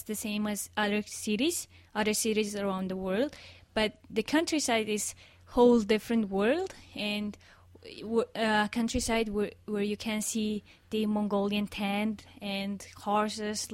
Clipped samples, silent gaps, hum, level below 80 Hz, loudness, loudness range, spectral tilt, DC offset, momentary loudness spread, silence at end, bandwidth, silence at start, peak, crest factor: under 0.1%; none; none; -54 dBFS; -30 LUFS; 4 LU; -4 dB/octave; under 0.1%; 9 LU; 0 s; 16 kHz; 0 s; -12 dBFS; 18 dB